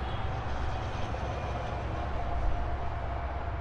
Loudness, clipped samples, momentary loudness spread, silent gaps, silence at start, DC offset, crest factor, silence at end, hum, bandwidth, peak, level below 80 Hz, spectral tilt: -35 LUFS; under 0.1%; 2 LU; none; 0 s; under 0.1%; 14 dB; 0 s; none; 8 kHz; -18 dBFS; -36 dBFS; -7 dB/octave